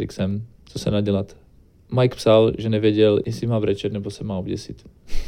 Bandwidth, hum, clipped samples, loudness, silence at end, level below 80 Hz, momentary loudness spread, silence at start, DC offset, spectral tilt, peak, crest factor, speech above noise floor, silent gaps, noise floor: 14.5 kHz; none; under 0.1%; -21 LUFS; 0 s; -36 dBFS; 15 LU; 0 s; under 0.1%; -7 dB/octave; -4 dBFS; 18 dB; 31 dB; none; -51 dBFS